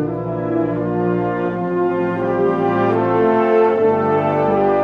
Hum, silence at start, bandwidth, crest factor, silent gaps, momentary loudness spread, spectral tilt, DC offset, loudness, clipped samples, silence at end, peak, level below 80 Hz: none; 0 s; 5.6 kHz; 14 dB; none; 6 LU; -9.5 dB/octave; under 0.1%; -17 LUFS; under 0.1%; 0 s; -4 dBFS; -50 dBFS